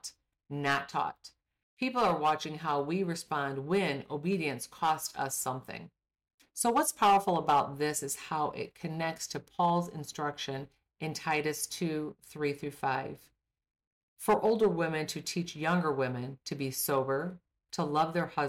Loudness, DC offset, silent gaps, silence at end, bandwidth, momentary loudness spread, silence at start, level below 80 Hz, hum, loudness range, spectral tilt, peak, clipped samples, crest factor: -32 LUFS; under 0.1%; 1.63-1.77 s, 6.34-6.38 s, 13.87-14.16 s; 0 s; 16.5 kHz; 12 LU; 0.05 s; -68 dBFS; none; 5 LU; -4.5 dB/octave; -18 dBFS; under 0.1%; 14 dB